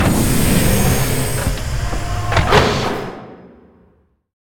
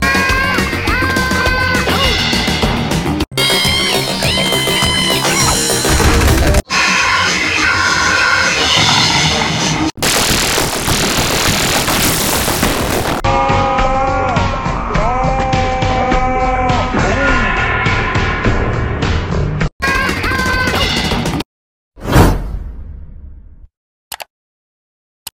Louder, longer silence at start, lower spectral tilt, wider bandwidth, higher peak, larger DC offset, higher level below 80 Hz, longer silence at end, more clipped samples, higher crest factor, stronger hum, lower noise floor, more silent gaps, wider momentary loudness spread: second, -17 LUFS vs -13 LUFS; about the same, 0 s vs 0 s; about the same, -4.5 dB/octave vs -3.5 dB/octave; about the same, 19.5 kHz vs 18.5 kHz; about the same, 0 dBFS vs 0 dBFS; second, under 0.1% vs 0.7%; about the same, -26 dBFS vs -22 dBFS; first, 1 s vs 0.05 s; neither; about the same, 16 dB vs 14 dB; neither; first, -56 dBFS vs -36 dBFS; second, none vs 19.72-19.79 s, 21.45-21.91 s, 23.77-24.11 s, 24.30-25.26 s; first, 9 LU vs 6 LU